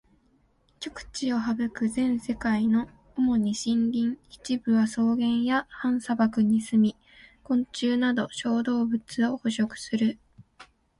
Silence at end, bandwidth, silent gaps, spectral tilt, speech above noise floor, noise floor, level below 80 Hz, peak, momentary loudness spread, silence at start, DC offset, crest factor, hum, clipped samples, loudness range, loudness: 0.35 s; 11.5 kHz; none; -5 dB/octave; 40 dB; -65 dBFS; -58 dBFS; -12 dBFS; 7 LU; 0.8 s; under 0.1%; 14 dB; none; under 0.1%; 2 LU; -26 LUFS